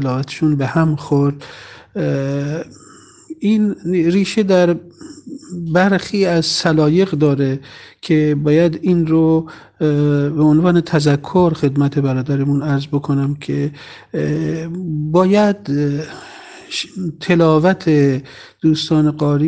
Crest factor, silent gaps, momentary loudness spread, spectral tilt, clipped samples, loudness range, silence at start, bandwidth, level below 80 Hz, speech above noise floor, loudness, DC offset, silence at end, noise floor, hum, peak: 16 dB; none; 13 LU; -7 dB/octave; under 0.1%; 4 LU; 0 s; 9.2 kHz; -48 dBFS; 21 dB; -16 LUFS; under 0.1%; 0 s; -36 dBFS; none; 0 dBFS